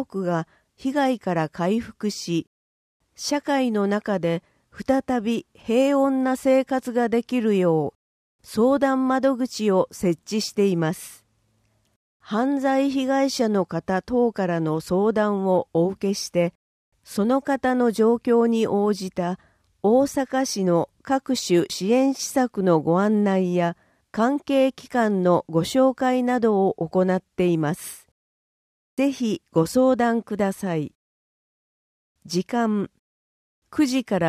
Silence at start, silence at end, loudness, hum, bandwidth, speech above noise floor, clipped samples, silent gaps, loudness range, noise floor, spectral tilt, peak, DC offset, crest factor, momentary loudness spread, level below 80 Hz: 0 s; 0 s; -22 LUFS; none; 15.5 kHz; 45 dB; under 0.1%; 2.47-3.00 s, 7.95-8.39 s, 11.96-12.20 s, 16.55-16.92 s, 28.11-28.97 s, 30.95-32.15 s, 32.99-33.62 s; 4 LU; -66 dBFS; -6 dB/octave; -6 dBFS; under 0.1%; 16 dB; 8 LU; -60 dBFS